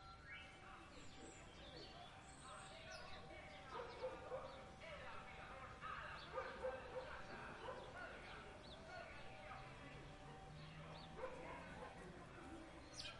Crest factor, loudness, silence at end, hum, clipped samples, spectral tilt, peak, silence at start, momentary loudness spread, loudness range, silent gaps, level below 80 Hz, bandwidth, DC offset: 18 dB; -55 LUFS; 0 s; none; under 0.1%; -4 dB/octave; -36 dBFS; 0 s; 8 LU; 4 LU; none; -68 dBFS; 11 kHz; under 0.1%